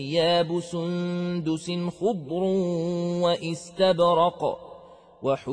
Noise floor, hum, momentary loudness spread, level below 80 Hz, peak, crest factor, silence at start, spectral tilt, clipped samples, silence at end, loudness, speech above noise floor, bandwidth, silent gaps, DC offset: -48 dBFS; none; 9 LU; -64 dBFS; -10 dBFS; 16 dB; 0 s; -6 dB/octave; under 0.1%; 0 s; -25 LUFS; 23 dB; 10 kHz; none; under 0.1%